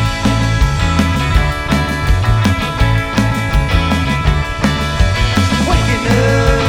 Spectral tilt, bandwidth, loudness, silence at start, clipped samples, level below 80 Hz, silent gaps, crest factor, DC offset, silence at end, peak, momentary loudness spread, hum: -5.5 dB/octave; 16.5 kHz; -14 LUFS; 0 s; under 0.1%; -18 dBFS; none; 12 dB; under 0.1%; 0 s; 0 dBFS; 3 LU; none